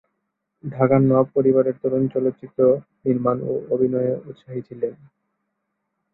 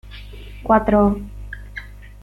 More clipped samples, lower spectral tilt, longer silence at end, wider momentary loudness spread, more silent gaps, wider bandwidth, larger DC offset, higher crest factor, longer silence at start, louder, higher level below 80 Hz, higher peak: neither; first, -13 dB/octave vs -8.5 dB/octave; first, 1.2 s vs 0 s; second, 15 LU vs 23 LU; neither; second, 4 kHz vs 5.6 kHz; neither; about the same, 20 dB vs 18 dB; first, 0.65 s vs 0.05 s; second, -21 LUFS vs -17 LUFS; second, -62 dBFS vs -34 dBFS; about the same, -2 dBFS vs -2 dBFS